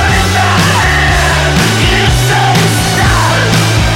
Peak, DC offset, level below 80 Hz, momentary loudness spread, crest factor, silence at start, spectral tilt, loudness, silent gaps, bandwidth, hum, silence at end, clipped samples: -2 dBFS; under 0.1%; -20 dBFS; 1 LU; 8 dB; 0 s; -4 dB/octave; -9 LUFS; none; 16.5 kHz; none; 0 s; under 0.1%